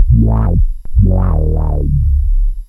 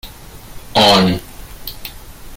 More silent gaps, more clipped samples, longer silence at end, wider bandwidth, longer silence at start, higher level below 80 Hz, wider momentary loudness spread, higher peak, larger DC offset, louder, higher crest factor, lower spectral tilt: neither; neither; about the same, 0.05 s vs 0 s; second, 1.9 kHz vs 17 kHz; about the same, 0 s vs 0.05 s; first, -12 dBFS vs -38 dBFS; second, 6 LU vs 24 LU; about the same, 0 dBFS vs 0 dBFS; neither; about the same, -14 LUFS vs -13 LUFS; second, 10 dB vs 18 dB; first, -12 dB/octave vs -4.5 dB/octave